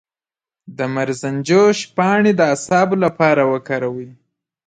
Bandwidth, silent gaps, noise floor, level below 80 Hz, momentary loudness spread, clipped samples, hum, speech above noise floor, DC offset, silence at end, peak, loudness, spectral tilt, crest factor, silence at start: 9.4 kHz; none; under -90 dBFS; -62 dBFS; 9 LU; under 0.1%; none; over 74 dB; under 0.1%; 0.55 s; 0 dBFS; -16 LUFS; -5.5 dB/octave; 16 dB; 0.7 s